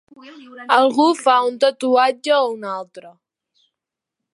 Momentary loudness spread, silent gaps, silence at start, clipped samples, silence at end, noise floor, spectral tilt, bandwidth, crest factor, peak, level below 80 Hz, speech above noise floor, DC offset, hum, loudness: 14 LU; none; 0.25 s; under 0.1%; 1.25 s; -84 dBFS; -3 dB/octave; 11.5 kHz; 18 dB; 0 dBFS; -80 dBFS; 67 dB; under 0.1%; none; -17 LUFS